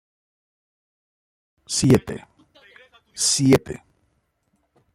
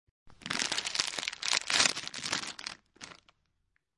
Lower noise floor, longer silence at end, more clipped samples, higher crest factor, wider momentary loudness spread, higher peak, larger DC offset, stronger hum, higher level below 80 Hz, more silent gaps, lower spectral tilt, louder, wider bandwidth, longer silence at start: second, -70 dBFS vs -78 dBFS; first, 1.2 s vs 0.85 s; neither; second, 22 dB vs 28 dB; about the same, 21 LU vs 22 LU; first, -2 dBFS vs -8 dBFS; neither; neither; first, -52 dBFS vs -70 dBFS; neither; first, -4.5 dB/octave vs 0.5 dB/octave; first, -19 LUFS vs -30 LUFS; first, 16 kHz vs 11.5 kHz; first, 1.7 s vs 0.25 s